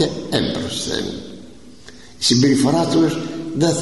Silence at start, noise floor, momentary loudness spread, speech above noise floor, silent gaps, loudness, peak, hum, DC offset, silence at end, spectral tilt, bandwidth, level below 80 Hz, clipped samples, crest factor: 0 s; -42 dBFS; 14 LU; 25 dB; none; -18 LUFS; -4 dBFS; none; 0.7%; 0 s; -4.5 dB/octave; 12 kHz; -48 dBFS; under 0.1%; 16 dB